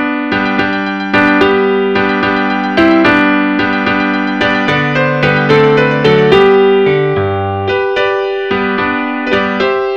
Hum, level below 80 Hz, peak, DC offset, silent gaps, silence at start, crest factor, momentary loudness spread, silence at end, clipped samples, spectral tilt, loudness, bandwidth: none; -42 dBFS; 0 dBFS; 0.4%; none; 0 s; 10 dB; 7 LU; 0 s; under 0.1%; -7 dB/octave; -11 LUFS; 7.4 kHz